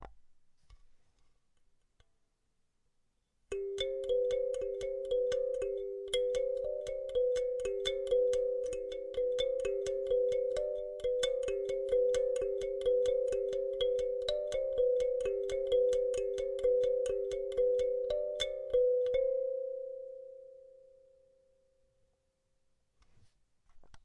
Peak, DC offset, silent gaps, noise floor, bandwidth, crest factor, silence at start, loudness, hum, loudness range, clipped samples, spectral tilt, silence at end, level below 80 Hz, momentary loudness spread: -20 dBFS; under 0.1%; none; -77 dBFS; 11.5 kHz; 16 dB; 0 s; -34 LUFS; none; 7 LU; under 0.1%; -3.5 dB/octave; 0.05 s; -58 dBFS; 8 LU